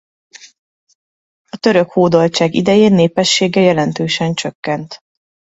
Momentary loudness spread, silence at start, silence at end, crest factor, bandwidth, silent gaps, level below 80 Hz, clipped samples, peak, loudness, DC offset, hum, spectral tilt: 11 LU; 1.55 s; 0.6 s; 16 dB; 8 kHz; 4.55-4.63 s; -54 dBFS; under 0.1%; 0 dBFS; -13 LUFS; under 0.1%; none; -5 dB/octave